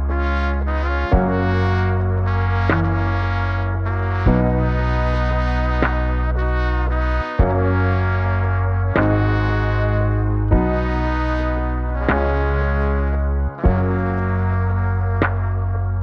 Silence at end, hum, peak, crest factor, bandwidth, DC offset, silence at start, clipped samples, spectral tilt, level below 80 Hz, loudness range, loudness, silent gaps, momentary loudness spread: 0 s; none; -2 dBFS; 16 dB; 6 kHz; under 0.1%; 0 s; under 0.1%; -9 dB/octave; -22 dBFS; 1 LU; -19 LUFS; none; 3 LU